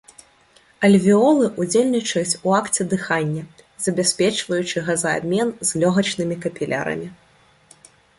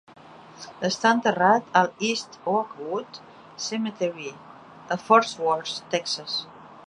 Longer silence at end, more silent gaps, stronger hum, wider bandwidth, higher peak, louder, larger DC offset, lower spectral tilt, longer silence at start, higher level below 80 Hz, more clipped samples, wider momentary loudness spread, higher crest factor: first, 1.05 s vs 0.05 s; neither; neither; about the same, 11.5 kHz vs 11 kHz; about the same, -4 dBFS vs -4 dBFS; first, -20 LUFS vs -24 LUFS; neither; about the same, -4.5 dB/octave vs -3.5 dB/octave; first, 0.8 s vs 0.3 s; first, -60 dBFS vs -74 dBFS; neither; second, 11 LU vs 19 LU; second, 16 dB vs 22 dB